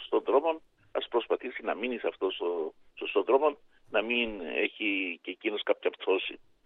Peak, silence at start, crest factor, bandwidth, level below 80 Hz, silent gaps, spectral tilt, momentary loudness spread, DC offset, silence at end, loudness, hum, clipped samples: -12 dBFS; 0 s; 20 dB; 4.1 kHz; -64 dBFS; none; -6 dB/octave; 10 LU; under 0.1%; 0.3 s; -31 LUFS; none; under 0.1%